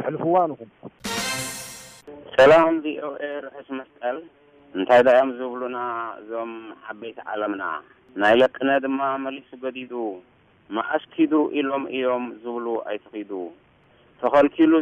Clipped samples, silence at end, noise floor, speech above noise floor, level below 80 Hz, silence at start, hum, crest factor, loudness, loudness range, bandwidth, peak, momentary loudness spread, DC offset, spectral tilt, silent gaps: under 0.1%; 0 s; -57 dBFS; 35 dB; -60 dBFS; 0 s; none; 14 dB; -22 LUFS; 5 LU; 15.5 kHz; -8 dBFS; 19 LU; under 0.1%; -4.5 dB/octave; none